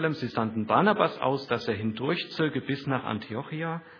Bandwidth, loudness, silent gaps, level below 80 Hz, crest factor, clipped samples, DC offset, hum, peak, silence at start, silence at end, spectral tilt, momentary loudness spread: 5.4 kHz; -28 LUFS; none; -68 dBFS; 22 dB; under 0.1%; under 0.1%; none; -6 dBFS; 0 s; 0 s; -7.5 dB/octave; 9 LU